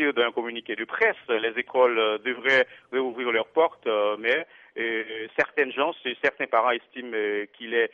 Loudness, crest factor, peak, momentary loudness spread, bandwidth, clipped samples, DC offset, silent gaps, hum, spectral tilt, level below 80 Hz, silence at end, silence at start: -25 LUFS; 18 dB; -8 dBFS; 9 LU; 7.2 kHz; under 0.1%; under 0.1%; none; none; -4.5 dB/octave; -74 dBFS; 0.05 s; 0 s